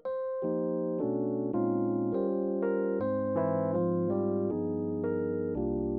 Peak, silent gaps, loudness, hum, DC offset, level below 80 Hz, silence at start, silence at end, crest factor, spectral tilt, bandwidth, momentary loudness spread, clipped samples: -18 dBFS; none; -31 LUFS; none; under 0.1%; -56 dBFS; 0.05 s; 0 s; 12 dB; -11 dB/octave; 4.1 kHz; 3 LU; under 0.1%